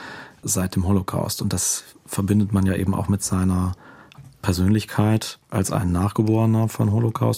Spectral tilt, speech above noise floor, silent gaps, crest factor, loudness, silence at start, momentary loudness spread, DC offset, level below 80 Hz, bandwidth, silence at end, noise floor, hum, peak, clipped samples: -5.5 dB/octave; 25 dB; none; 16 dB; -22 LUFS; 0 s; 8 LU; under 0.1%; -46 dBFS; 16 kHz; 0 s; -46 dBFS; none; -6 dBFS; under 0.1%